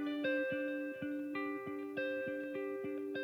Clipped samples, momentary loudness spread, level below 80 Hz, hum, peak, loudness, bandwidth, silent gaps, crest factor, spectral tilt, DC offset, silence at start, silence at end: under 0.1%; 6 LU; -82 dBFS; none; -26 dBFS; -40 LUFS; 15.5 kHz; none; 14 dB; -6.5 dB/octave; under 0.1%; 0 s; 0 s